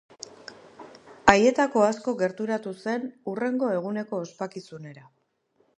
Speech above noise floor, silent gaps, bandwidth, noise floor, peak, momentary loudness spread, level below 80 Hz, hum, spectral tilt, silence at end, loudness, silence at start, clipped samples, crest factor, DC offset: 44 dB; none; 10.5 kHz; -69 dBFS; 0 dBFS; 23 LU; -58 dBFS; none; -5 dB/octave; 0.8 s; -25 LUFS; 0.5 s; under 0.1%; 26 dB; under 0.1%